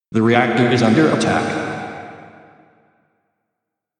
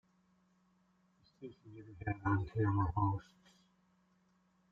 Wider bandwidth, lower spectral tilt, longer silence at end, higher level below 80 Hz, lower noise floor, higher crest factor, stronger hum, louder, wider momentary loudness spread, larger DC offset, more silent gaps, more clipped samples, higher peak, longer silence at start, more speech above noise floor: first, 10.5 kHz vs 5 kHz; second, -6 dB/octave vs -10 dB/octave; first, 1.7 s vs 1.5 s; about the same, -56 dBFS vs -58 dBFS; first, -79 dBFS vs -74 dBFS; about the same, 18 dB vs 20 dB; neither; first, -16 LUFS vs -37 LUFS; second, 17 LU vs 20 LU; neither; neither; neither; first, 0 dBFS vs -22 dBFS; second, 0.1 s vs 1.4 s; first, 64 dB vs 37 dB